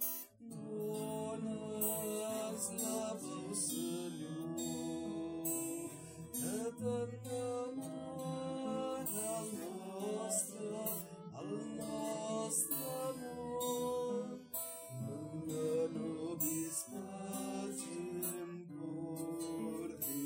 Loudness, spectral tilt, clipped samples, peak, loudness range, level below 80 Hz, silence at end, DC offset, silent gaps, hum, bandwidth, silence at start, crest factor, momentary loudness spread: -41 LUFS; -4.5 dB/octave; under 0.1%; -22 dBFS; 2 LU; -76 dBFS; 0 s; under 0.1%; none; none; 16 kHz; 0 s; 20 dB; 8 LU